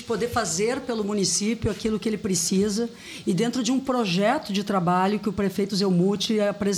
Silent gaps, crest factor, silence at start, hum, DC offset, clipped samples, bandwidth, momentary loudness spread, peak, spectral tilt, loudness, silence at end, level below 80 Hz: none; 14 dB; 0 s; none; under 0.1%; under 0.1%; 19 kHz; 5 LU; -10 dBFS; -4.5 dB/octave; -24 LUFS; 0 s; -52 dBFS